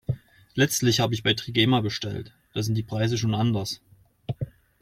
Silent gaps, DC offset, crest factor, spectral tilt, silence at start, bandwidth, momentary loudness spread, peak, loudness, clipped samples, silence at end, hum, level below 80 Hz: none; under 0.1%; 18 dB; -4.5 dB/octave; 0.1 s; 16 kHz; 15 LU; -8 dBFS; -25 LUFS; under 0.1%; 0.3 s; none; -54 dBFS